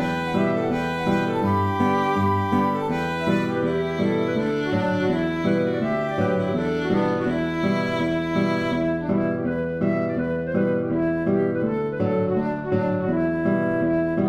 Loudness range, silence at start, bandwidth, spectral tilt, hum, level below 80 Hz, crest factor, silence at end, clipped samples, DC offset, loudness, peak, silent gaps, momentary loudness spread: 1 LU; 0 s; 13 kHz; -8 dB/octave; none; -50 dBFS; 14 dB; 0 s; under 0.1%; under 0.1%; -23 LUFS; -8 dBFS; none; 3 LU